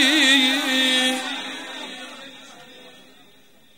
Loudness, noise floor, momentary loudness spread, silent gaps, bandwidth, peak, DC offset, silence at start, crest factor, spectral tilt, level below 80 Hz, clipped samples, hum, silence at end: -18 LUFS; -55 dBFS; 23 LU; none; 16 kHz; -2 dBFS; 0.2%; 0 s; 22 dB; 0 dB/octave; -76 dBFS; under 0.1%; none; 0.9 s